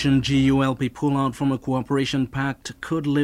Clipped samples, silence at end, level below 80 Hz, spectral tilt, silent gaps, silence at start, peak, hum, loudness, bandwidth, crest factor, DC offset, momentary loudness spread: under 0.1%; 0 s; -44 dBFS; -6.5 dB/octave; none; 0 s; -8 dBFS; none; -23 LUFS; 12 kHz; 14 dB; under 0.1%; 8 LU